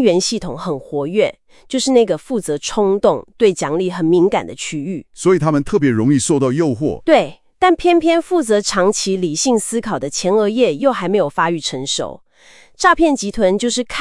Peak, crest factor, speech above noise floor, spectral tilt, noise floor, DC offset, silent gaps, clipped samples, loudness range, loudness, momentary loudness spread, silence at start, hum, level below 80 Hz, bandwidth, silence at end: 0 dBFS; 16 dB; 31 dB; -4.5 dB/octave; -46 dBFS; under 0.1%; none; under 0.1%; 2 LU; -16 LUFS; 8 LU; 0 s; none; -44 dBFS; 12 kHz; 0 s